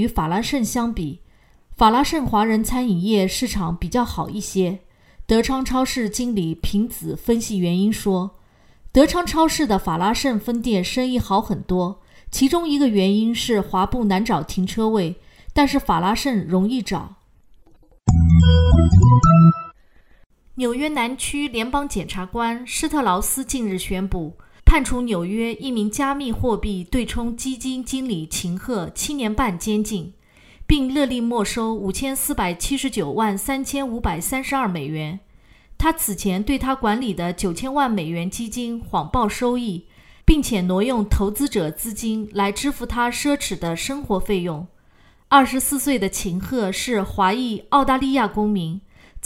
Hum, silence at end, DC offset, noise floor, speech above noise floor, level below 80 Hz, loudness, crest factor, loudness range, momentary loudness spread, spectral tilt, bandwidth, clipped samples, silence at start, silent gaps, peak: none; 0.05 s; under 0.1%; -53 dBFS; 33 dB; -30 dBFS; -21 LUFS; 20 dB; 7 LU; 10 LU; -5.5 dB/octave; 16 kHz; under 0.1%; 0 s; 20.26-20.30 s; 0 dBFS